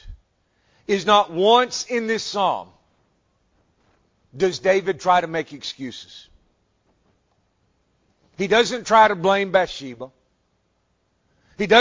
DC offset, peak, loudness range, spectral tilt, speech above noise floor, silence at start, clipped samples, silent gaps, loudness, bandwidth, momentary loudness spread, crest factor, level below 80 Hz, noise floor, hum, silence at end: under 0.1%; -2 dBFS; 6 LU; -3.5 dB/octave; 48 dB; 0.05 s; under 0.1%; none; -20 LUFS; 7.6 kHz; 18 LU; 22 dB; -54 dBFS; -68 dBFS; none; 0 s